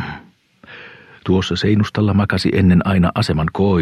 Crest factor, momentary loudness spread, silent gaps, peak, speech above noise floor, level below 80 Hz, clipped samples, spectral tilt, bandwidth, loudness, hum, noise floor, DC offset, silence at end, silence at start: 12 dB; 22 LU; none; -4 dBFS; 32 dB; -38 dBFS; under 0.1%; -7 dB/octave; 11 kHz; -16 LUFS; none; -47 dBFS; under 0.1%; 0 s; 0 s